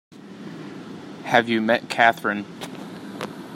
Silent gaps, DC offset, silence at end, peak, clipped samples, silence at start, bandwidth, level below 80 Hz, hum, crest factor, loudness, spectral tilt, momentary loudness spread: none; under 0.1%; 0 s; -2 dBFS; under 0.1%; 0.1 s; 16 kHz; -70 dBFS; none; 24 dB; -21 LUFS; -4.5 dB/octave; 20 LU